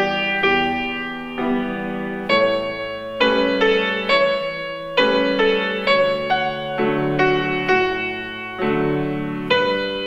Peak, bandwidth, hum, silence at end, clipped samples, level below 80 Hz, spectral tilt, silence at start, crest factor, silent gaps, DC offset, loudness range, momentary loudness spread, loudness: -4 dBFS; 9 kHz; none; 0 s; under 0.1%; -48 dBFS; -6 dB/octave; 0 s; 16 dB; none; under 0.1%; 2 LU; 9 LU; -19 LUFS